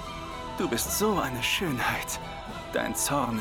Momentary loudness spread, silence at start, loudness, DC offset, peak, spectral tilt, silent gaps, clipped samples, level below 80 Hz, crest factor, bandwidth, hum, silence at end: 11 LU; 0 s; -28 LUFS; under 0.1%; -12 dBFS; -3 dB/octave; none; under 0.1%; -46 dBFS; 18 dB; over 20 kHz; none; 0 s